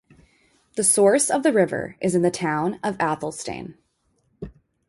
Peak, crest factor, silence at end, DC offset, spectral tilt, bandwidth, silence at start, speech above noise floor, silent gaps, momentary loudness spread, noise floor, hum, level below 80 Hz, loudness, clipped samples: -6 dBFS; 18 dB; 0.4 s; under 0.1%; -4 dB/octave; 12 kHz; 0.75 s; 47 dB; none; 24 LU; -68 dBFS; none; -56 dBFS; -21 LUFS; under 0.1%